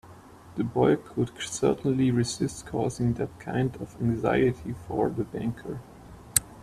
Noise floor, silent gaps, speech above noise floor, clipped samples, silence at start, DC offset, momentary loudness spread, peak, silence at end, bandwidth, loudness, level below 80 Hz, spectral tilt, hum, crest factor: -49 dBFS; none; 22 dB; under 0.1%; 0.05 s; under 0.1%; 9 LU; -2 dBFS; 0 s; 15.5 kHz; -28 LUFS; -52 dBFS; -5.5 dB/octave; none; 26 dB